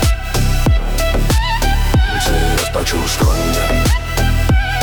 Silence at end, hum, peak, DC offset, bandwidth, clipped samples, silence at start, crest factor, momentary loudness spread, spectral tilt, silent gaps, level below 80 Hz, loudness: 0 s; none; -4 dBFS; under 0.1%; over 20 kHz; under 0.1%; 0 s; 10 dB; 2 LU; -4.5 dB/octave; none; -16 dBFS; -16 LUFS